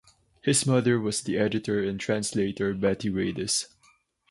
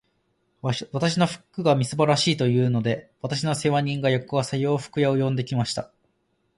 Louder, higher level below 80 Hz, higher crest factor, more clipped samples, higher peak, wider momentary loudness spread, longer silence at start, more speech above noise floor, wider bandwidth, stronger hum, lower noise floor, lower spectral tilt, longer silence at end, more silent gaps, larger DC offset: about the same, -26 LUFS vs -24 LUFS; about the same, -56 dBFS vs -60 dBFS; about the same, 18 dB vs 18 dB; neither; second, -10 dBFS vs -6 dBFS; about the same, 6 LU vs 8 LU; second, 0.45 s vs 0.65 s; second, 38 dB vs 47 dB; about the same, 11.5 kHz vs 11.5 kHz; neither; second, -64 dBFS vs -70 dBFS; about the same, -4.5 dB/octave vs -5.5 dB/octave; about the same, 0.65 s vs 0.75 s; neither; neither